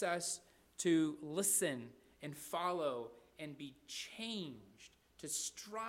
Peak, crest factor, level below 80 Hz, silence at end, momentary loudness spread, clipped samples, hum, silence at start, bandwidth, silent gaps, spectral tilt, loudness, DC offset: -22 dBFS; 20 dB; -78 dBFS; 0 s; 18 LU; under 0.1%; none; 0 s; 16 kHz; none; -3 dB/octave; -39 LUFS; under 0.1%